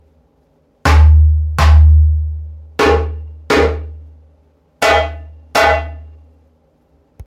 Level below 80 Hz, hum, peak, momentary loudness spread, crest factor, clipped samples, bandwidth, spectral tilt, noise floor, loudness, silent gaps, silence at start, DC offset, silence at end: -16 dBFS; none; 0 dBFS; 18 LU; 14 dB; under 0.1%; 12 kHz; -6 dB/octave; -56 dBFS; -13 LUFS; none; 0.85 s; under 0.1%; 1.25 s